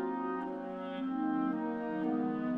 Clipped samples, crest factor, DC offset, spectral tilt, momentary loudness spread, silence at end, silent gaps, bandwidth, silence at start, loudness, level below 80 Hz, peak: under 0.1%; 12 dB; under 0.1%; -9 dB/octave; 6 LU; 0 s; none; 4.8 kHz; 0 s; -36 LUFS; -72 dBFS; -22 dBFS